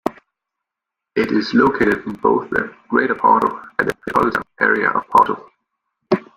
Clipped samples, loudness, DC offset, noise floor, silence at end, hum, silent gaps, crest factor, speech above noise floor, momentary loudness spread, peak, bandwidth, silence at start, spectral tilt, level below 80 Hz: under 0.1%; -18 LUFS; under 0.1%; -84 dBFS; 0.15 s; none; none; 18 dB; 66 dB; 8 LU; 0 dBFS; 16 kHz; 0.05 s; -6.5 dB/octave; -52 dBFS